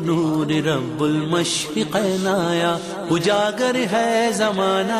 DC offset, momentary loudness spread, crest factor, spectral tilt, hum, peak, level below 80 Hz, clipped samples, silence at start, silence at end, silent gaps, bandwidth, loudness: under 0.1%; 3 LU; 12 dB; -4.5 dB/octave; none; -8 dBFS; -58 dBFS; under 0.1%; 0 s; 0 s; none; 15 kHz; -20 LUFS